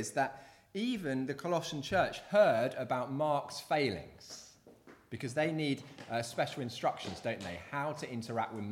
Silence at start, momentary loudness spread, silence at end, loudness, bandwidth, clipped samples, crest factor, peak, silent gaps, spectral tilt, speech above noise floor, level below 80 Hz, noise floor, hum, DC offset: 0 s; 12 LU; 0 s; -35 LUFS; 16 kHz; under 0.1%; 20 dB; -16 dBFS; none; -5 dB/octave; 24 dB; -68 dBFS; -59 dBFS; none; under 0.1%